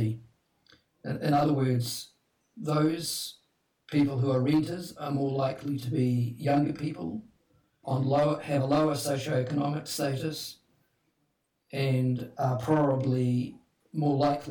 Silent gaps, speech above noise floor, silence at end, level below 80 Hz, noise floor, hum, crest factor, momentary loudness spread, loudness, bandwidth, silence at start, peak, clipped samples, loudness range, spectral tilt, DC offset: none; 48 dB; 0 s; -64 dBFS; -76 dBFS; none; 16 dB; 12 LU; -29 LUFS; 19 kHz; 0 s; -12 dBFS; under 0.1%; 2 LU; -6.5 dB/octave; under 0.1%